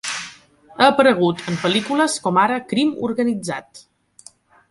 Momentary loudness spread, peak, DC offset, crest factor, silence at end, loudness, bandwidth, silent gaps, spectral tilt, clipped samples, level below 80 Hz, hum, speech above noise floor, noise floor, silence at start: 13 LU; 0 dBFS; under 0.1%; 18 dB; 0.9 s; -18 LUFS; 11.5 kHz; none; -4.5 dB/octave; under 0.1%; -62 dBFS; none; 31 dB; -49 dBFS; 0.05 s